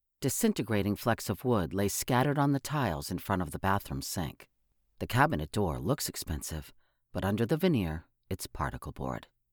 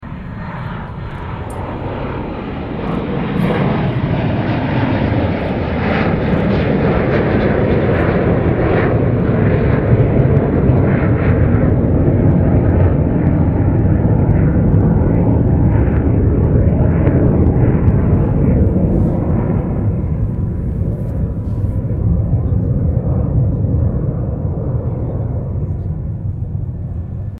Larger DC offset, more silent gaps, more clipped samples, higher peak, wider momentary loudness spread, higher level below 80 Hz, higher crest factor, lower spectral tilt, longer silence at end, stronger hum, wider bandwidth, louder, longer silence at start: neither; neither; neither; second, -10 dBFS vs 0 dBFS; about the same, 12 LU vs 10 LU; second, -50 dBFS vs -22 dBFS; first, 22 dB vs 14 dB; second, -5 dB/octave vs -10.5 dB/octave; first, 0.3 s vs 0 s; neither; first, over 20 kHz vs 5.2 kHz; second, -31 LUFS vs -15 LUFS; first, 0.2 s vs 0 s